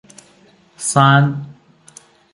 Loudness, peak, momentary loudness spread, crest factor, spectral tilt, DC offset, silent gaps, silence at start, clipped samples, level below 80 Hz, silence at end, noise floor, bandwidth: -14 LUFS; 0 dBFS; 19 LU; 18 dB; -5 dB/octave; under 0.1%; none; 0.8 s; under 0.1%; -60 dBFS; 0.8 s; -51 dBFS; 11.5 kHz